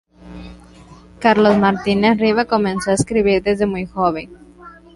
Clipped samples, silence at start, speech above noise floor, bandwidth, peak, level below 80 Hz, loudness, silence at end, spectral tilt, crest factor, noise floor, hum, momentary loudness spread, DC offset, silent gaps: under 0.1%; 0.25 s; 27 dB; 11.5 kHz; -2 dBFS; -44 dBFS; -16 LUFS; 0.25 s; -5.5 dB/octave; 16 dB; -42 dBFS; none; 19 LU; under 0.1%; none